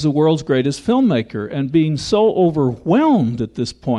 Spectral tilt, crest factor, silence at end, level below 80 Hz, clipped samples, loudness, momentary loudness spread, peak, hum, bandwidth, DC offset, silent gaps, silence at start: -7 dB/octave; 12 dB; 0 s; -48 dBFS; under 0.1%; -17 LUFS; 9 LU; -4 dBFS; none; 11 kHz; under 0.1%; none; 0 s